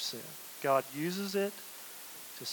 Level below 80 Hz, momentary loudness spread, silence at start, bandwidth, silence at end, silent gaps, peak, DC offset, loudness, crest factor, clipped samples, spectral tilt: -90 dBFS; 13 LU; 0 s; 19 kHz; 0 s; none; -14 dBFS; under 0.1%; -36 LUFS; 22 dB; under 0.1%; -3.5 dB/octave